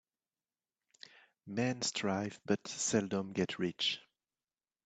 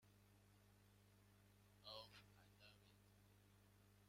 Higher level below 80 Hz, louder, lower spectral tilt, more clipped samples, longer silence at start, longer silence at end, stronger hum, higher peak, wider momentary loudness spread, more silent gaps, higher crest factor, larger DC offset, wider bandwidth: first, -76 dBFS vs -82 dBFS; first, -36 LUFS vs -63 LUFS; about the same, -3.5 dB/octave vs -4 dB/octave; neither; first, 1.45 s vs 0 s; first, 0.85 s vs 0 s; second, none vs 50 Hz at -75 dBFS; first, -16 dBFS vs -44 dBFS; about the same, 10 LU vs 10 LU; neither; about the same, 22 dB vs 24 dB; neither; second, 9 kHz vs 16 kHz